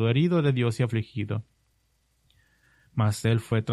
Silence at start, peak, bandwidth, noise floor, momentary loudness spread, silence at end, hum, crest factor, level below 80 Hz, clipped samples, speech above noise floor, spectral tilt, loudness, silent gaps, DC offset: 0 s; -10 dBFS; 12.5 kHz; -69 dBFS; 10 LU; 0 s; none; 16 dB; -60 dBFS; under 0.1%; 45 dB; -7 dB/octave; -26 LUFS; none; under 0.1%